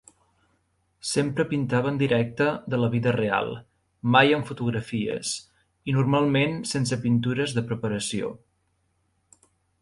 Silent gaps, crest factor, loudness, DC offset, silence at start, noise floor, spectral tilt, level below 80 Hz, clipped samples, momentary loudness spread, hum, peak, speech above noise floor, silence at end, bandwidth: none; 22 dB; -25 LUFS; under 0.1%; 1.05 s; -71 dBFS; -5.5 dB/octave; -58 dBFS; under 0.1%; 10 LU; none; -2 dBFS; 47 dB; 1.45 s; 11.5 kHz